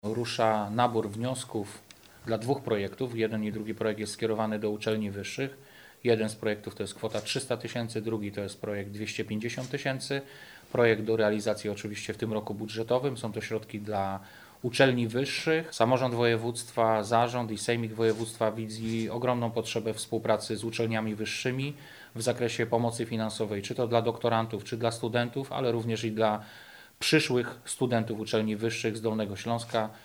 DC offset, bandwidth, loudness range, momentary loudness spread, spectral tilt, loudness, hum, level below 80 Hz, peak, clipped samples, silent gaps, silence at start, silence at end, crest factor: under 0.1%; over 20 kHz; 5 LU; 10 LU; -5 dB/octave; -30 LUFS; none; -68 dBFS; -8 dBFS; under 0.1%; none; 0.05 s; 0 s; 22 dB